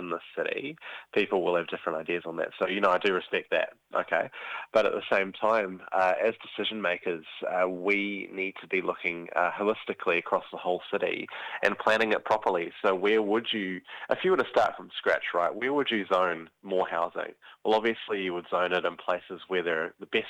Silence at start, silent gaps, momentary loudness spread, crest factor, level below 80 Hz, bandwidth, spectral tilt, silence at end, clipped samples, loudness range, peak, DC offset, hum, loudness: 0 s; none; 8 LU; 22 dB; -70 dBFS; 11 kHz; -5 dB/octave; 0 s; under 0.1%; 2 LU; -6 dBFS; under 0.1%; none; -29 LUFS